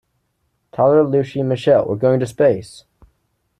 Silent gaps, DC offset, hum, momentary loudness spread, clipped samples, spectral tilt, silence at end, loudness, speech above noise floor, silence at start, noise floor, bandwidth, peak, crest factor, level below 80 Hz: none; under 0.1%; none; 7 LU; under 0.1%; -7.5 dB/octave; 0.8 s; -16 LUFS; 53 dB; 0.8 s; -68 dBFS; 11.5 kHz; -4 dBFS; 14 dB; -56 dBFS